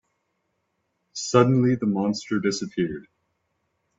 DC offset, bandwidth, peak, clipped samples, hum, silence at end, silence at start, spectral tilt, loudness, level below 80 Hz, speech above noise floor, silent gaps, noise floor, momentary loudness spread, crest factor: under 0.1%; 8 kHz; -2 dBFS; under 0.1%; none; 0.95 s; 1.15 s; -6 dB/octave; -23 LUFS; -62 dBFS; 53 dB; none; -75 dBFS; 13 LU; 22 dB